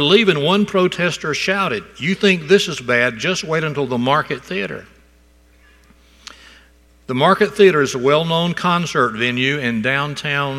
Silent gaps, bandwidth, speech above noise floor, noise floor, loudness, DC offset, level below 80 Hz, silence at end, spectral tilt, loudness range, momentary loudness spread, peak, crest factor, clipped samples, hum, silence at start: none; 13.5 kHz; 34 dB; -51 dBFS; -17 LUFS; under 0.1%; -52 dBFS; 0 s; -4.5 dB/octave; 8 LU; 9 LU; 0 dBFS; 18 dB; under 0.1%; none; 0 s